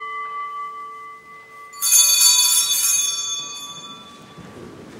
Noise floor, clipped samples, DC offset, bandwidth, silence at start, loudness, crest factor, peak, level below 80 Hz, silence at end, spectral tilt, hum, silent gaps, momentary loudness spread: -41 dBFS; under 0.1%; under 0.1%; 16 kHz; 0 s; -14 LUFS; 22 dB; 0 dBFS; -66 dBFS; 0 s; 2.5 dB/octave; none; none; 23 LU